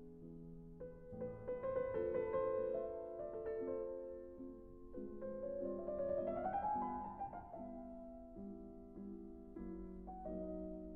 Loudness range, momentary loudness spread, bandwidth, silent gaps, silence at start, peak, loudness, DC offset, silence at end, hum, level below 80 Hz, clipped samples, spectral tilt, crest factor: 8 LU; 14 LU; 4 kHz; none; 0 s; -30 dBFS; -45 LUFS; under 0.1%; 0 s; none; -62 dBFS; under 0.1%; -8.5 dB/octave; 16 dB